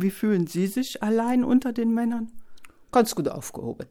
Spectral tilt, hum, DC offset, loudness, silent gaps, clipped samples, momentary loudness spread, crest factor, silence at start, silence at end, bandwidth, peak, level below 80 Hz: -6 dB/octave; none; under 0.1%; -25 LUFS; none; under 0.1%; 12 LU; 18 dB; 0 s; 0.05 s; 18.5 kHz; -6 dBFS; -58 dBFS